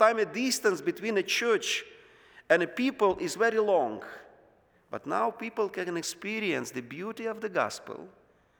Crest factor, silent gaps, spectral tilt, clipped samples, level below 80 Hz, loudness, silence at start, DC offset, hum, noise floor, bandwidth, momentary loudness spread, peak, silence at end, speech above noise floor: 22 dB; none; -3 dB/octave; under 0.1%; -70 dBFS; -29 LUFS; 0 s; under 0.1%; none; -63 dBFS; over 20 kHz; 15 LU; -8 dBFS; 0.5 s; 34 dB